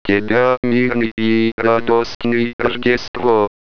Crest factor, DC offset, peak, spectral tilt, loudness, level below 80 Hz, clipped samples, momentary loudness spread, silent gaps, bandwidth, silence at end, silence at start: 16 dB; 3%; 0 dBFS; -6.5 dB/octave; -16 LUFS; -44 dBFS; under 0.1%; 3 LU; 0.57-0.63 s, 1.11-1.17 s, 1.52-1.58 s, 2.15-2.20 s, 2.53-2.59 s, 3.08-3.14 s; 5.4 kHz; 0.3 s; 0.05 s